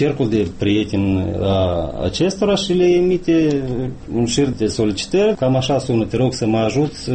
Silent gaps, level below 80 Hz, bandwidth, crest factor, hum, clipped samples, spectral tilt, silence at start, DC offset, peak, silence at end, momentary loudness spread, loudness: none; -38 dBFS; 8.8 kHz; 12 dB; none; under 0.1%; -6 dB/octave; 0 s; under 0.1%; -6 dBFS; 0 s; 5 LU; -18 LUFS